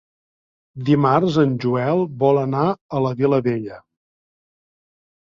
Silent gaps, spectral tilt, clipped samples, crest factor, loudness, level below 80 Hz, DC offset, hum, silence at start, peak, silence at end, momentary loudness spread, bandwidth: 2.81-2.89 s; -8.5 dB/octave; under 0.1%; 18 dB; -19 LUFS; -58 dBFS; under 0.1%; none; 0.75 s; -2 dBFS; 1.4 s; 8 LU; 7.4 kHz